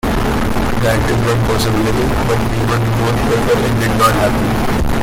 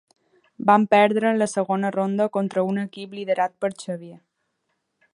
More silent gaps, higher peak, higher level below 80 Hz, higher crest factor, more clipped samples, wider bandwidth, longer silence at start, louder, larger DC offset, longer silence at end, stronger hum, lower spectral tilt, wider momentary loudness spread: neither; about the same, 0 dBFS vs -2 dBFS; first, -24 dBFS vs -74 dBFS; second, 12 dB vs 20 dB; neither; first, 17 kHz vs 11 kHz; second, 0.05 s vs 0.6 s; first, -15 LUFS vs -22 LUFS; neither; second, 0 s vs 0.95 s; neither; about the same, -6 dB/octave vs -6 dB/octave; second, 4 LU vs 16 LU